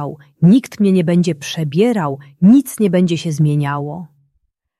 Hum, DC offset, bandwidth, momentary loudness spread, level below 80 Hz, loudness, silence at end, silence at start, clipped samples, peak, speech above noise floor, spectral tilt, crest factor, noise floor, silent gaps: none; under 0.1%; 13 kHz; 12 LU; -58 dBFS; -15 LUFS; 0.75 s; 0 s; under 0.1%; -2 dBFS; 52 dB; -7 dB/octave; 12 dB; -67 dBFS; none